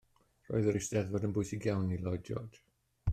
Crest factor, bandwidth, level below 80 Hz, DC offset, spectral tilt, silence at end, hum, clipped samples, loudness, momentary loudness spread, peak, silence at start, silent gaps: 16 dB; 14 kHz; -52 dBFS; under 0.1%; -6.5 dB/octave; 0 s; none; under 0.1%; -35 LUFS; 10 LU; -18 dBFS; 0.5 s; none